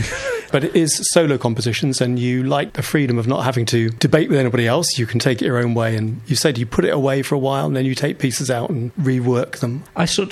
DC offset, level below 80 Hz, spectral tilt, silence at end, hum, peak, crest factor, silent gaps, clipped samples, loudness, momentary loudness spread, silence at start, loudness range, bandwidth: under 0.1%; -48 dBFS; -5 dB/octave; 0 s; none; 0 dBFS; 18 dB; none; under 0.1%; -18 LUFS; 5 LU; 0 s; 2 LU; 14.5 kHz